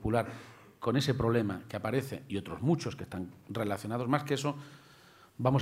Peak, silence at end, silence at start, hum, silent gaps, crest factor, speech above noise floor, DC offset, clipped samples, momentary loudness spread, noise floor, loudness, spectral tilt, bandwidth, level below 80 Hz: -12 dBFS; 0 s; 0 s; none; none; 22 dB; 26 dB; under 0.1%; under 0.1%; 13 LU; -58 dBFS; -33 LUFS; -6.5 dB/octave; 16 kHz; -58 dBFS